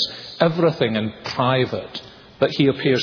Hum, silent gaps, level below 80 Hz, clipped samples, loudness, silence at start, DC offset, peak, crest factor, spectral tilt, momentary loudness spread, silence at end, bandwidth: none; none; -56 dBFS; under 0.1%; -20 LUFS; 0 s; under 0.1%; -2 dBFS; 18 dB; -6.5 dB/octave; 10 LU; 0 s; 5.4 kHz